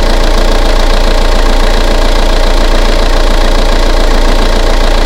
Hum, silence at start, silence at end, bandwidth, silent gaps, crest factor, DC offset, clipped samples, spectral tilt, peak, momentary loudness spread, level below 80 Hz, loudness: none; 0 s; 0 s; 12.5 kHz; none; 6 dB; under 0.1%; 2%; -4.5 dB/octave; 0 dBFS; 0 LU; -6 dBFS; -11 LUFS